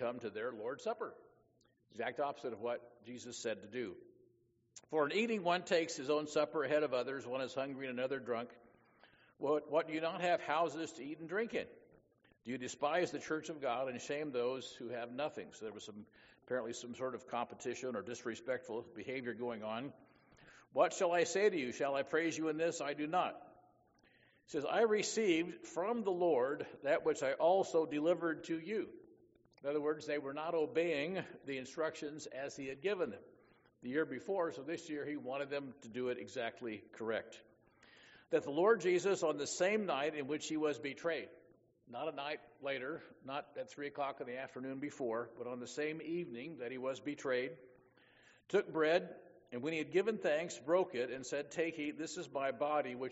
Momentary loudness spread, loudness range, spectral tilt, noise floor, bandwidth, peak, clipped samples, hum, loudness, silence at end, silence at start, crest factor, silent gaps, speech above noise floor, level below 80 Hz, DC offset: 12 LU; 8 LU; -3.5 dB/octave; -75 dBFS; 8 kHz; -18 dBFS; under 0.1%; none; -39 LUFS; 0 s; 0 s; 20 dB; none; 36 dB; -82 dBFS; under 0.1%